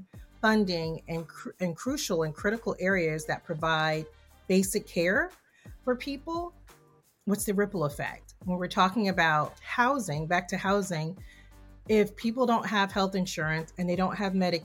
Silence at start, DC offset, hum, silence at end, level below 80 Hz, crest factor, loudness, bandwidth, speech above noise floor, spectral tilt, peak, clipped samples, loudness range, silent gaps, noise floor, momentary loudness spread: 0 s; under 0.1%; none; 0 s; -54 dBFS; 20 dB; -29 LUFS; 17 kHz; 34 dB; -5 dB/octave; -10 dBFS; under 0.1%; 3 LU; none; -62 dBFS; 11 LU